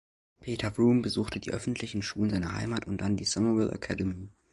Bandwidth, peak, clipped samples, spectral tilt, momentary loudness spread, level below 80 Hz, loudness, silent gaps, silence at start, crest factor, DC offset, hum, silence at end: 11.5 kHz; -14 dBFS; under 0.1%; -5.5 dB/octave; 9 LU; -50 dBFS; -30 LUFS; none; 0.4 s; 16 dB; under 0.1%; none; 0.25 s